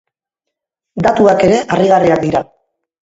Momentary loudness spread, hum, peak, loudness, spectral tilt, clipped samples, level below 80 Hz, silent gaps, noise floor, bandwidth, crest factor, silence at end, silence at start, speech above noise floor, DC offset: 8 LU; none; 0 dBFS; -12 LUFS; -6.5 dB/octave; under 0.1%; -46 dBFS; none; -79 dBFS; 8 kHz; 14 dB; 0.7 s; 0.95 s; 68 dB; under 0.1%